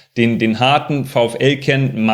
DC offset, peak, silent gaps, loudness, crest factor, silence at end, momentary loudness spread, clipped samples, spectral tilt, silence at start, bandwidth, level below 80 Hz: under 0.1%; 0 dBFS; none; -15 LUFS; 14 dB; 0 s; 3 LU; under 0.1%; -6 dB/octave; 0.15 s; 13 kHz; -54 dBFS